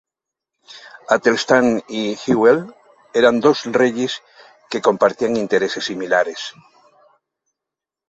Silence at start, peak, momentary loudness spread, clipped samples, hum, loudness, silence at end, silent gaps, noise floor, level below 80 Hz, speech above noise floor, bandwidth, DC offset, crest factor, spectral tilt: 0.7 s; 0 dBFS; 15 LU; under 0.1%; none; -17 LUFS; 1.6 s; none; -86 dBFS; -62 dBFS; 69 dB; 8 kHz; under 0.1%; 18 dB; -4.5 dB/octave